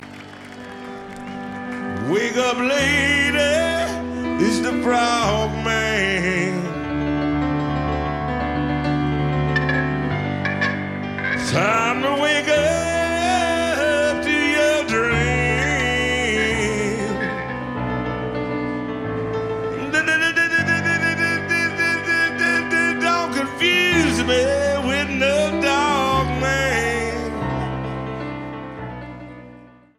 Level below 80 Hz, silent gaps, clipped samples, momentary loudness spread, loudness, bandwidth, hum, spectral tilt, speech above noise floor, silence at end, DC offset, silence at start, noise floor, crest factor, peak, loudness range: -38 dBFS; none; under 0.1%; 11 LU; -20 LUFS; 14.5 kHz; none; -4.5 dB/octave; 27 dB; 0.3 s; under 0.1%; 0 s; -45 dBFS; 16 dB; -4 dBFS; 4 LU